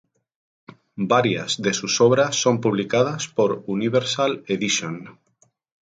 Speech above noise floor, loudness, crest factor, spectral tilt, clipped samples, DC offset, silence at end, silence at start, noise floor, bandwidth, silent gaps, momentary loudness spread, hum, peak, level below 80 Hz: 43 dB; -21 LUFS; 18 dB; -4 dB/octave; under 0.1%; under 0.1%; 0.7 s; 0.95 s; -64 dBFS; 9.4 kHz; none; 7 LU; none; -4 dBFS; -64 dBFS